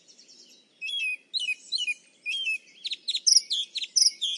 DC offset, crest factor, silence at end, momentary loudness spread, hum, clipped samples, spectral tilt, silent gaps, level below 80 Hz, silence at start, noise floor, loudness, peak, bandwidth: under 0.1%; 24 dB; 0 s; 13 LU; none; under 0.1%; 6 dB/octave; none; under -90 dBFS; 0.8 s; -55 dBFS; -25 LUFS; -6 dBFS; 11.5 kHz